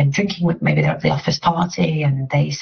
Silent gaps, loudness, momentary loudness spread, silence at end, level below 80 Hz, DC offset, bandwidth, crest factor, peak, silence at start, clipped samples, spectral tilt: none; -19 LUFS; 2 LU; 0 s; -48 dBFS; under 0.1%; 6.6 kHz; 12 dB; -4 dBFS; 0 s; under 0.1%; -5.5 dB/octave